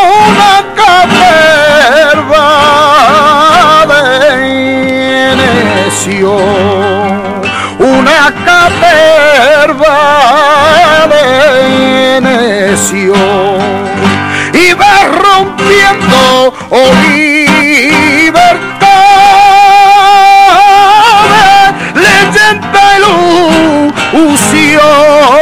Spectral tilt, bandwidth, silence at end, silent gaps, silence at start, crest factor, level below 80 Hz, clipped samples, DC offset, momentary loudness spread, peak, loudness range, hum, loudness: -3.5 dB/octave; 17 kHz; 0 s; none; 0 s; 4 dB; -36 dBFS; 8%; under 0.1%; 7 LU; 0 dBFS; 5 LU; none; -4 LUFS